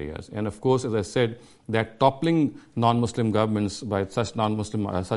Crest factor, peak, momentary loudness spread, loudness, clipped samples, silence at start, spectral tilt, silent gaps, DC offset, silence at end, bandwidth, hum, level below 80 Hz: 20 dB; -6 dBFS; 6 LU; -25 LUFS; under 0.1%; 0 s; -6.5 dB/octave; none; under 0.1%; 0 s; 11.5 kHz; none; -52 dBFS